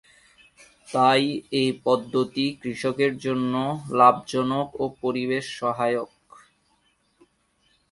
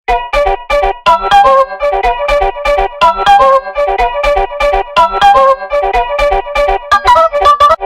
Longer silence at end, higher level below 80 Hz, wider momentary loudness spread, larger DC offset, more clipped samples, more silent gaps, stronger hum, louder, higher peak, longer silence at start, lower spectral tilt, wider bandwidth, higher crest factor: first, 1.85 s vs 0 s; second, -64 dBFS vs -26 dBFS; first, 10 LU vs 6 LU; neither; second, under 0.1% vs 1%; neither; neither; second, -24 LUFS vs -9 LUFS; second, -4 dBFS vs 0 dBFS; first, 0.9 s vs 0.1 s; first, -5.5 dB/octave vs -3.5 dB/octave; second, 11.5 kHz vs 15.5 kHz; first, 22 dB vs 10 dB